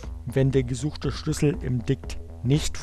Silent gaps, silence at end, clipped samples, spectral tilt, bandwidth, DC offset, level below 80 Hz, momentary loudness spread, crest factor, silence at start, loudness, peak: none; 0 s; under 0.1%; -6.5 dB/octave; 13 kHz; under 0.1%; -38 dBFS; 7 LU; 16 dB; 0 s; -26 LUFS; -10 dBFS